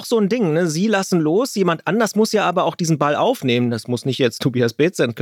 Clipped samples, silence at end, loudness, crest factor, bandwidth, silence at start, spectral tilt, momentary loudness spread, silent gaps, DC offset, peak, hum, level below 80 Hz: under 0.1%; 0 s; -18 LUFS; 16 dB; 17 kHz; 0 s; -5.5 dB/octave; 2 LU; none; under 0.1%; -2 dBFS; none; -74 dBFS